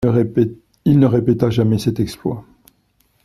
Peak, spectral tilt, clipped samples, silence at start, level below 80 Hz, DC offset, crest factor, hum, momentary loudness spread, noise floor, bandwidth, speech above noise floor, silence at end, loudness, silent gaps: 0 dBFS; -8.5 dB/octave; under 0.1%; 0 s; -46 dBFS; under 0.1%; 18 dB; none; 11 LU; -61 dBFS; 13.5 kHz; 45 dB; 0.8 s; -17 LUFS; none